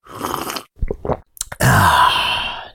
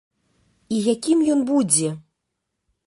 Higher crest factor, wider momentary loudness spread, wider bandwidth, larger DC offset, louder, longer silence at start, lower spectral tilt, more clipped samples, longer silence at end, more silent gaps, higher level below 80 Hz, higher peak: about the same, 16 dB vs 20 dB; first, 15 LU vs 10 LU; first, 19.5 kHz vs 11.5 kHz; neither; first, -17 LUFS vs -20 LUFS; second, 0.1 s vs 0.7 s; about the same, -3.5 dB/octave vs -4.5 dB/octave; neither; second, 0.05 s vs 0.9 s; neither; first, -32 dBFS vs -66 dBFS; about the same, -2 dBFS vs -4 dBFS